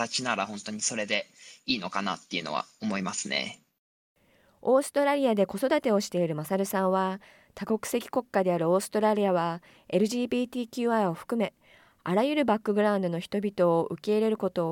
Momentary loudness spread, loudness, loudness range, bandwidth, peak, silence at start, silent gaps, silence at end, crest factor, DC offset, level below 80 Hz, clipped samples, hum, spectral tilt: 8 LU; -28 LUFS; 4 LU; 17.5 kHz; -12 dBFS; 0 s; 3.78-4.15 s; 0 s; 16 dB; under 0.1%; -70 dBFS; under 0.1%; none; -4.5 dB/octave